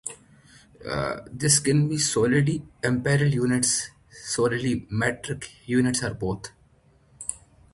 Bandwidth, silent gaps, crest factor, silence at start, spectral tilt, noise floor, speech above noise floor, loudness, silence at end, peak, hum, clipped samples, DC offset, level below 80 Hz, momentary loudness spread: 12 kHz; none; 20 dB; 0.05 s; -4.5 dB/octave; -59 dBFS; 35 dB; -24 LUFS; 0.35 s; -6 dBFS; none; under 0.1%; under 0.1%; -52 dBFS; 14 LU